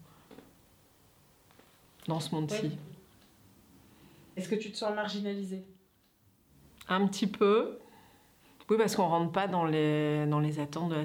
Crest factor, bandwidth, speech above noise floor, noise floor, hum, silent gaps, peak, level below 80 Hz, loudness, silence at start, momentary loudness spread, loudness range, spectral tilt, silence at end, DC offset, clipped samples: 18 dB; over 20 kHz; 37 dB; -67 dBFS; none; none; -16 dBFS; -72 dBFS; -31 LUFS; 0 s; 16 LU; 10 LU; -6 dB/octave; 0 s; under 0.1%; under 0.1%